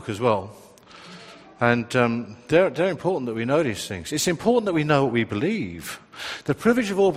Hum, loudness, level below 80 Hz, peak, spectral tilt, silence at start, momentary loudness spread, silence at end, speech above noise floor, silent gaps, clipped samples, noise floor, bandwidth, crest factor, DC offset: none; -23 LUFS; -58 dBFS; -2 dBFS; -5 dB/octave; 0 s; 14 LU; 0 s; 23 dB; none; under 0.1%; -46 dBFS; 15.5 kHz; 20 dB; under 0.1%